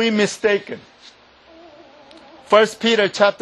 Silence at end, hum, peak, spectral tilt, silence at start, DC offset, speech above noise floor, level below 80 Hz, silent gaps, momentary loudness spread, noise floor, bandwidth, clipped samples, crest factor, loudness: 0.1 s; none; -2 dBFS; -3.5 dB/octave; 0 s; under 0.1%; 29 dB; -64 dBFS; none; 12 LU; -47 dBFS; 12 kHz; under 0.1%; 18 dB; -17 LUFS